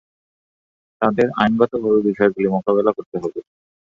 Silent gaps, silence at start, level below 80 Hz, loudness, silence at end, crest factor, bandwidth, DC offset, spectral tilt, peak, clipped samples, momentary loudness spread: 3.06-3.12 s; 1 s; -56 dBFS; -19 LUFS; 0.45 s; 18 dB; 7.2 kHz; under 0.1%; -8 dB/octave; -2 dBFS; under 0.1%; 10 LU